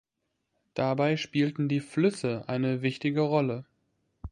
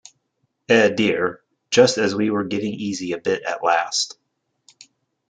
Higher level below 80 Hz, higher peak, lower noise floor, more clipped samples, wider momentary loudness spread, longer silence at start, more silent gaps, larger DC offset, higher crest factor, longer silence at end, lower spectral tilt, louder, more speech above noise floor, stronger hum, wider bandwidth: first, -56 dBFS vs -66 dBFS; second, -12 dBFS vs -2 dBFS; first, -81 dBFS vs -72 dBFS; neither; second, 6 LU vs 10 LU; about the same, 0.75 s vs 0.7 s; neither; neither; about the same, 18 dB vs 20 dB; second, 0.05 s vs 1.2 s; first, -7 dB/octave vs -3.5 dB/octave; second, -28 LUFS vs -20 LUFS; about the same, 53 dB vs 53 dB; neither; first, 11 kHz vs 9.4 kHz